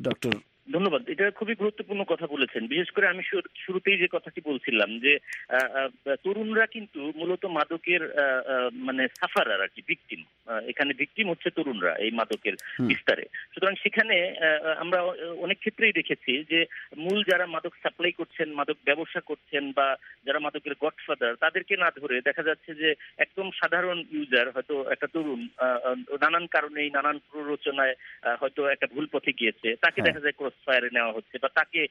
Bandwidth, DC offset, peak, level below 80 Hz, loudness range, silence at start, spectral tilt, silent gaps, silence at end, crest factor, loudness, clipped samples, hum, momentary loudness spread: 10.5 kHz; under 0.1%; -6 dBFS; -74 dBFS; 3 LU; 0 s; -5 dB/octave; none; 0.05 s; 22 dB; -27 LUFS; under 0.1%; none; 9 LU